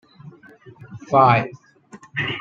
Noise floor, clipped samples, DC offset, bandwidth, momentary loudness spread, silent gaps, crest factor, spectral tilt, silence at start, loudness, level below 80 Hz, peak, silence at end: -46 dBFS; under 0.1%; under 0.1%; 7.8 kHz; 25 LU; none; 20 dB; -7 dB/octave; 0.25 s; -18 LUFS; -60 dBFS; -2 dBFS; 0 s